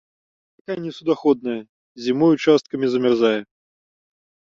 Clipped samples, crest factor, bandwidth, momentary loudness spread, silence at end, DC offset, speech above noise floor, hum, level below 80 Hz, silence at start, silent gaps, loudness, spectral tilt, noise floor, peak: under 0.1%; 18 dB; 7.6 kHz; 12 LU; 1.05 s; under 0.1%; over 71 dB; none; -66 dBFS; 0.7 s; 1.69-1.95 s; -20 LUFS; -6.5 dB/octave; under -90 dBFS; -4 dBFS